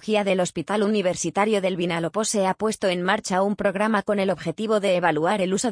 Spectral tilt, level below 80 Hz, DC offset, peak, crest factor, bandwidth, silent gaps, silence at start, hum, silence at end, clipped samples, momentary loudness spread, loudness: -4.5 dB/octave; -60 dBFS; under 0.1%; -6 dBFS; 16 dB; 10.5 kHz; none; 0 s; none; 0 s; under 0.1%; 3 LU; -23 LUFS